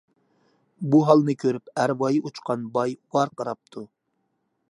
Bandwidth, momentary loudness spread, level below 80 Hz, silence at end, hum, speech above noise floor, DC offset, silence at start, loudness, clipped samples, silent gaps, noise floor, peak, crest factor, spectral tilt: 11 kHz; 16 LU; -74 dBFS; 0.85 s; none; 52 dB; under 0.1%; 0.8 s; -23 LUFS; under 0.1%; none; -74 dBFS; -2 dBFS; 22 dB; -7 dB/octave